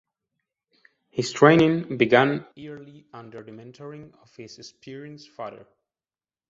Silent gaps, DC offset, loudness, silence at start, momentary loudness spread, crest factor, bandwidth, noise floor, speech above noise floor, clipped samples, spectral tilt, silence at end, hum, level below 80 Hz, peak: none; under 0.1%; -20 LUFS; 1.15 s; 26 LU; 24 dB; 8 kHz; under -90 dBFS; over 66 dB; under 0.1%; -6 dB/octave; 0.95 s; none; -64 dBFS; -2 dBFS